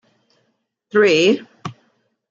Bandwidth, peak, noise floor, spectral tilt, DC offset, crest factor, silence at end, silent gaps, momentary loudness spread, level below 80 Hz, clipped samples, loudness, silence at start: 7.8 kHz; -4 dBFS; -69 dBFS; -4.5 dB/octave; under 0.1%; 18 dB; 0.6 s; none; 21 LU; -68 dBFS; under 0.1%; -16 LUFS; 0.95 s